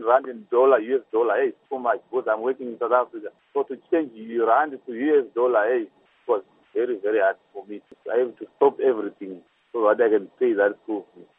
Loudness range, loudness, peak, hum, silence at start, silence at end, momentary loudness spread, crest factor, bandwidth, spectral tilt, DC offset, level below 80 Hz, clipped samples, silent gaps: 2 LU; -23 LUFS; -4 dBFS; none; 0 s; 0.35 s; 14 LU; 20 dB; 3.8 kHz; -8.5 dB/octave; under 0.1%; -86 dBFS; under 0.1%; none